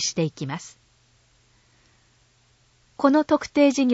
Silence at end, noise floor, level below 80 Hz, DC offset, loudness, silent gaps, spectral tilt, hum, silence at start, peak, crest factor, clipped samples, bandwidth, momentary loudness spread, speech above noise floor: 0 s; -61 dBFS; -62 dBFS; under 0.1%; -22 LUFS; none; -4.5 dB/octave; none; 0 s; -6 dBFS; 20 dB; under 0.1%; 8 kHz; 15 LU; 40 dB